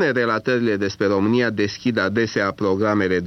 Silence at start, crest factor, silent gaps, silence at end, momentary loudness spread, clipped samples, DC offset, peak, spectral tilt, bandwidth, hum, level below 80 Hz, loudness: 0 s; 12 dB; none; 0 s; 3 LU; under 0.1%; under 0.1%; -8 dBFS; -6 dB/octave; 7.2 kHz; none; -58 dBFS; -20 LUFS